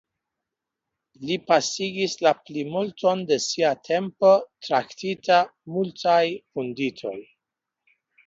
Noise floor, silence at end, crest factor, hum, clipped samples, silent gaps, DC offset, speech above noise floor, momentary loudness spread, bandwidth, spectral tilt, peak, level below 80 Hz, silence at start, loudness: -85 dBFS; 1.05 s; 20 dB; none; under 0.1%; none; under 0.1%; 62 dB; 10 LU; 7.8 kHz; -4 dB/octave; -4 dBFS; -72 dBFS; 1.2 s; -23 LUFS